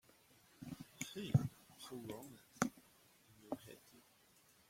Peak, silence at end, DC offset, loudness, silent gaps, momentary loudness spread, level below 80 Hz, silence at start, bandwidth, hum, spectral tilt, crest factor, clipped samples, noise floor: -16 dBFS; 0.7 s; under 0.1%; -44 LUFS; none; 26 LU; -72 dBFS; 0.6 s; 16.5 kHz; none; -5.5 dB/octave; 30 dB; under 0.1%; -70 dBFS